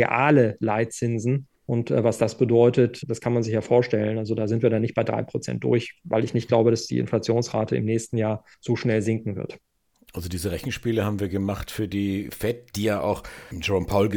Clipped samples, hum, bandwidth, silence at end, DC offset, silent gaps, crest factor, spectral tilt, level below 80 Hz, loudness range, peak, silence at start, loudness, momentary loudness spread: under 0.1%; none; 18.5 kHz; 0 s; under 0.1%; none; 20 dB; -6.5 dB/octave; -50 dBFS; 6 LU; -4 dBFS; 0 s; -24 LUFS; 9 LU